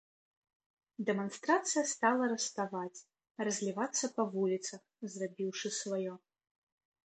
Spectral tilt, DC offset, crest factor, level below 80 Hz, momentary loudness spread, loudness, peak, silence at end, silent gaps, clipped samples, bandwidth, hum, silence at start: -3.5 dB/octave; under 0.1%; 22 dB; -86 dBFS; 15 LU; -35 LUFS; -14 dBFS; 0.9 s; none; under 0.1%; 9 kHz; none; 1 s